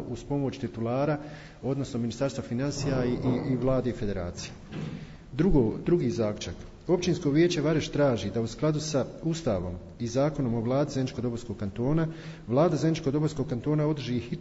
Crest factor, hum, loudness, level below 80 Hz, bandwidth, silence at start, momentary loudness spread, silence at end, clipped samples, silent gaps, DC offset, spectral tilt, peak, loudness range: 16 dB; none; -28 LUFS; -44 dBFS; 8 kHz; 0 s; 12 LU; 0 s; under 0.1%; none; under 0.1%; -6.5 dB/octave; -12 dBFS; 3 LU